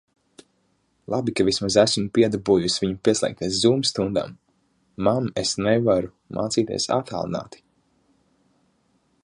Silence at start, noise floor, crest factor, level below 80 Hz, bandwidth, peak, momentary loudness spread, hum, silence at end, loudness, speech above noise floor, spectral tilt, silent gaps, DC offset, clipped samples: 1.1 s; -68 dBFS; 20 dB; -52 dBFS; 11.5 kHz; -2 dBFS; 10 LU; none; 1.75 s; -22 LUFS; 46 dB; -4.5 dB/octave; none; under 0.1%; under 0.1%